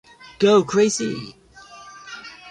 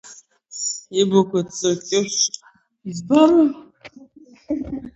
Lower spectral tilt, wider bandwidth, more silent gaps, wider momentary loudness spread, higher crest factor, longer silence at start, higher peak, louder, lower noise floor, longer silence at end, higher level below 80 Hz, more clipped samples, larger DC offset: about the same, -4.5 dB/octave vs -4 dB/octave; first, 10.5 kHz vs 8.2 kHz; neither; first, 24 LU vs 20 LU; about the same, 16 dB vs 18 dB; first, 0.4 s vs 0.05 s; second, -6 dBFS vs -2 dBFS; about the same, -19 LUFS vs -19 LUFS; second, -44 dBFS vs -48 dBFS; about the same, 0 s vs 0.05 s; second, -60 dBFS vs -54 dBFS; neither; neither